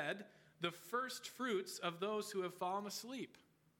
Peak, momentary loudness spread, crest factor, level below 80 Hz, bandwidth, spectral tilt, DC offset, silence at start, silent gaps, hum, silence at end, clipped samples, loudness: -24 dBFS; 8 LU; 20 dB; under -90 dBFS; 18 kHz; -3.5 dB/octave; under 0.1%; 0 s; none; none; 0.4 s; under 0.1%; -43 LUFS